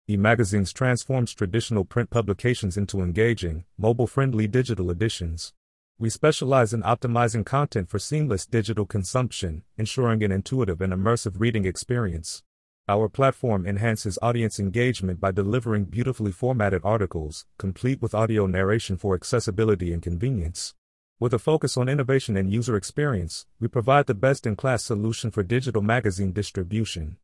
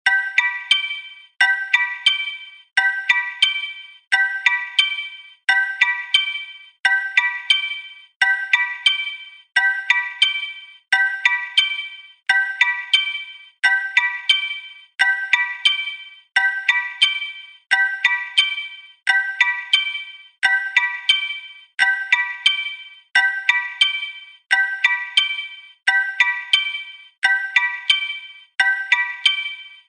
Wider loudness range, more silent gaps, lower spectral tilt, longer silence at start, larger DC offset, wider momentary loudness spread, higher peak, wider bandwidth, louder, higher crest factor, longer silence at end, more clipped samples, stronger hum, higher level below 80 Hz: about the same, 2 LU vs 1 LU; first, 5.57-5.95 s, 12.46-12.84 s, 20.78-21.16 s vs 4.07-4.11 s, 8.16-8.20 s, 27.18-27.22 s; first, -6 dB/octave vs 4 dB/octave; about the same, 0.1 s vs 0.05 s; neither; second, 7 LU vs 14 LU; second, -6 dBFS vs -2 dBFS; first, 12 kHz vs 10 kHz; second, -25 LUFS vs -18 LUFS; about the same, 18 dB vs 18 dB; about the same, 0.1 s vs 0.15 s; neither; neither; first, -48 dBFS vs -70 dBFS